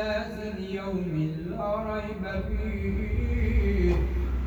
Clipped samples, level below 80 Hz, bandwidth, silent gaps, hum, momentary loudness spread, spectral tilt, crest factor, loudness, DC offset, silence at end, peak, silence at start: under 0.1%; -30 dBFS; 7.4 kHz; none; none; 7 LU; -8.5 dB/octave; 16 dB; -29 LUFS; under 0.1%; 0 s; -12 dBFS; 0 s